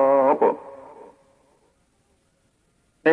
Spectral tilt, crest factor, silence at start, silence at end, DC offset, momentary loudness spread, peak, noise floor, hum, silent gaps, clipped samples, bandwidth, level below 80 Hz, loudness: -7 dB/octave; 18 dB; 0 s; 0 s; under 0.1%; 26 LU; -6 dBFS; -66 dBFS; none; none; under 0.1%; 4.6 kHz; -72 dBFS; -21 LUFS